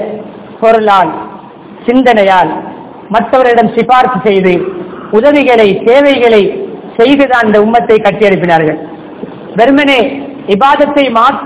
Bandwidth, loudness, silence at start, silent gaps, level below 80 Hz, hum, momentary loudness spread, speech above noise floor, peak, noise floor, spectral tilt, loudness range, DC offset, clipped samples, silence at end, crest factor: 4 kHz; -8 LUFS; 0 s; none; -44 dBFS; none; 15 LU; 23 dB; 0 dBFS; -29 dBFS; -9.5 dB/octave; 2 LU; under 0.1%; 5%; 0 s; 8 dB